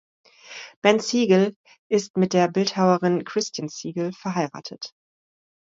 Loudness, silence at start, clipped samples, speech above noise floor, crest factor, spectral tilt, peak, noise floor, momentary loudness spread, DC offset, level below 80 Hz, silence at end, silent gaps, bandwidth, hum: -22 LUFS; 0.45 s; under 0.1%; 21 dB; 20 dB; -5 dB/octave; -4 dBFS; -42 dBFS; 17 LU; under 0.1%; -70 dBFS; 0.8 s; 0.76-0.82 s, 1.56-1.64 s, 1.79-1.90 s, 2.10-2.14 s; 7.8 kHz; none